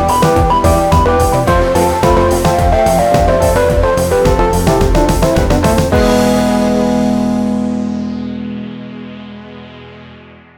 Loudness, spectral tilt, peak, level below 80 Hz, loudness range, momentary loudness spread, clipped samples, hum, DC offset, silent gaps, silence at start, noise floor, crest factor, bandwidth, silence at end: -12 LUFS; -6 dB/octave; 0 dBFS; -22 dBFS; 7 LU; 16 LU; under 0.1%; none; under 0.1%; none; 0 s; -37 dBFS; 12 dB; over 20 kHz; 0.35 s